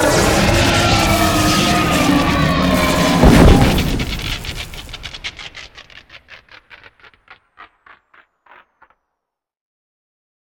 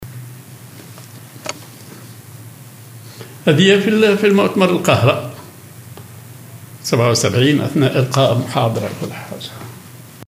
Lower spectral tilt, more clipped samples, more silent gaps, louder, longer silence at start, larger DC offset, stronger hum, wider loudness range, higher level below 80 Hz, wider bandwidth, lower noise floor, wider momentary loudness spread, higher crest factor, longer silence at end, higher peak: about the same, -4.5 dB/octave vs -5.5 dB/octave; neither; neither; about the same, -13 LUFS vs -15 LUFS; about the same, 0 s vs 0 s; neither; neither; first, 21 LU vs 6 LU; first, -24 dBFS vs -62 dBFS; first, 19.5 kHz vs 16 kHz; first, -79 dBFS vs -37 dBFS; second, 19 LU vs 24 LU; about the same, 16 dB vs 18 dB; first, 2.95 s vs 0.05 s; about the same, 0 dBFS vs 0 dBFS